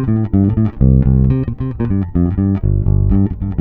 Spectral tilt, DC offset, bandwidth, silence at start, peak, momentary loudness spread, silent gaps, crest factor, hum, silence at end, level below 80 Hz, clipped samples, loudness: -13.5 dB/octave; under 0.1%; 3.1 kHz; 0 s; 0 dBFS; 6 LU; none; 12 dB; none; 0 s; -20 dBFS; under 0.1%; -15 LUFS